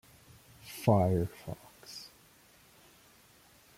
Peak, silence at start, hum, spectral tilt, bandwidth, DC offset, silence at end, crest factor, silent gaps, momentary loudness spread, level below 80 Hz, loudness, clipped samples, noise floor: -12 dBFS; 0.65 s; none; -7 dB/octave; 16.5 kHz; under 0.1%; 1.7 s; 24 dB; none; 22 LU; -62 dBFS; -30 LUFS; under 0.1%; -61 dBFS